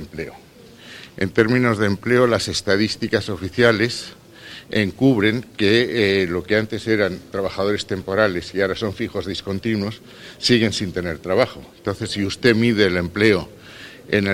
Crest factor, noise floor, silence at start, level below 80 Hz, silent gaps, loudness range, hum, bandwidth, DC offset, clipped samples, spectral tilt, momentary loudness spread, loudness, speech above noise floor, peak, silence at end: 20 dB; -42 dBFS; 0 s; -48 dBFS; none; 3 LU; none; 16 kHz; under 0.1%; under 0.1%; -5.5 dB/octave; 16 LU; -20 LUFS; 22 dB; 0 dBFS; 0 s